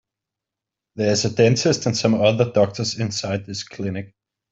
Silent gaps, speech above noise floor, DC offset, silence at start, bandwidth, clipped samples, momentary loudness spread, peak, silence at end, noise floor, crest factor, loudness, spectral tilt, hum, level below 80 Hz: none; 66 dB; under 0.1%; 0.95 s; 8 kHz; under 0.1%; 11 LU; -2 dBFS; 0.45 s; -86 dBFS; 18 dB; -20 LUFS; -5 dB/octave; none; -58 dBFS